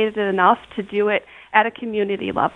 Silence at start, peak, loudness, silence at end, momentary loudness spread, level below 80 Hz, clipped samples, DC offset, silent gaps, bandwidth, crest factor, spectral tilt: 0 s; 0 dBFS; -20 LUFS; 0.05 s; 7 LU; -58 dBFS; under 0.1%; under 0.1%; none; 4 kHz; 20 dB; -7 dB/octave